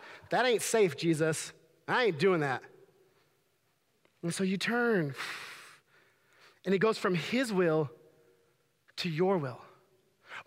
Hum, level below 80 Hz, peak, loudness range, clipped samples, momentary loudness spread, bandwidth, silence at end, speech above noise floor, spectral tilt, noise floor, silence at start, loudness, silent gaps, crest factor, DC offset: none; -80 dBFS; -14 dBFS; 5 LU; under 0.1%; 15 LU; 16 kHz; 0.05 s; 45 dB; -5 dB/octave; -74 dBFS; 0 s; -31 LUFS; none; 18 dB; under 0.1%